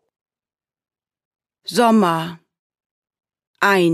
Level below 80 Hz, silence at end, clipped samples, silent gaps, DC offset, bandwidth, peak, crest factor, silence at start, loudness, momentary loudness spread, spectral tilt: -70 dBFS; 0 s; under 0.1%; 2.59-2.70 s, 2.86-3.02 s, 3.47-3.54 s; under 0.1%; 15.5 kHz; -2 dBFS; 18 dB; 1.7 s; -17 LUFS; 15 LU; -5 dB/octave